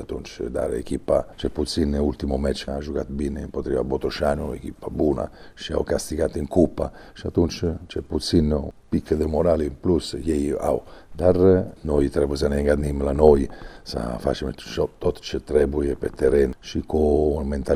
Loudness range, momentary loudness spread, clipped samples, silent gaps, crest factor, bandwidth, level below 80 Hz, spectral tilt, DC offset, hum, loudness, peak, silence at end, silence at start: 5 LU; 11 LU; under 0.1%; none; 22 dB; 15 kHz; -34 dBFS; -6.5 dB/octave; under 0.1%; none; -23 LUFS; 0 dBFS; 0 s; 0 s